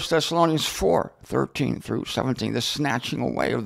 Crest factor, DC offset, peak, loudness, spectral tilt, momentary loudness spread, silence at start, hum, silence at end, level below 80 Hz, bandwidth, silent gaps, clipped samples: 18 dB; under 0.1%; -6 dBFS; -24 LUFS; -4.5 dB/octave; 6 LU; 0 s; none; 0 s; -48 dBFS; 16 kHz; none; under 0.1%